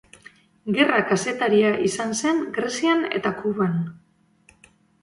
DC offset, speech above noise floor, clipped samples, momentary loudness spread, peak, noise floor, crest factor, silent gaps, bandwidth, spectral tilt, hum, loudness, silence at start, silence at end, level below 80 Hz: under 0.1%; 36 dB; under 0.1%; 8 LU; -6 dBFS; -58 dBFS; 18 dB; none; 11.5 kHz; -4.5 dB/octave; none; -22 LUFS; 0.65 s; 1.05 s; -64 dBFS